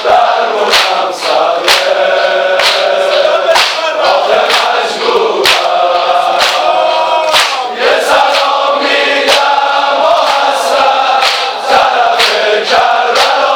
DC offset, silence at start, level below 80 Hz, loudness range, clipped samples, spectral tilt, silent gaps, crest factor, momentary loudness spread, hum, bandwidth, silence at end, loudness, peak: under 0.1%; 0 s; -52 dBFS; 0 LU; under 0.1%; -0.5 dB/octave; none; 10 dB; 3 LU; none; over 20 kHz; 0 s; -9 LUFS; 0 dBFS